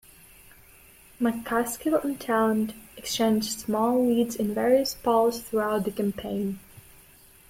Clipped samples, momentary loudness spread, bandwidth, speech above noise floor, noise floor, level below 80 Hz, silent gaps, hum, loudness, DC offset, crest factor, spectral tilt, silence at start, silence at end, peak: under 0.1%; 8 LU; 16.5 kHz; 29 dB; -54 dBFS; -58 dBFS; none; none; -26 LUFS; under 0.1%; 16 dB; -4.5 dB/octave; 1.2 s; 0.7 s; -10 dBFS